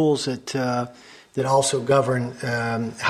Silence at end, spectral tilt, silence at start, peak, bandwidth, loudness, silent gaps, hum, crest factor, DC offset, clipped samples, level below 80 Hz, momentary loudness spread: 0 s; -4.5 dB/octave; 0 s; -6 dBFS; 14.5 kHz; -23 LUFS; none; none; 16 dB; under 0.1%; under 0.1%; -60 dBFS; 8 LU